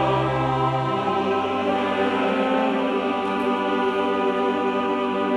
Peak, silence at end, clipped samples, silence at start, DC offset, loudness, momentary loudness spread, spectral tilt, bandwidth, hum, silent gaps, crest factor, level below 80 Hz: -10 dBFS; 0 s; under 0.1%; 0 s; under 0.1%; -22 LUFS; 2 LU; -7 dB/octave; 11 kHz; none; none; 12 dB; -52 dBFS